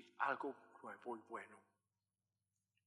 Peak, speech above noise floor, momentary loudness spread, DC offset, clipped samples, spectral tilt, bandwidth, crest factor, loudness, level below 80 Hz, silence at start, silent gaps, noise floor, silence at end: -24 dBFS; over 40 dB; 15 LU; under 0.1%; under 0.1%; -5 dB/octave; 11.5 kHz; 26 dB; -47 LUFS; under -90 dBFS; 0 s; none; under -90 dBFS; 1.25 s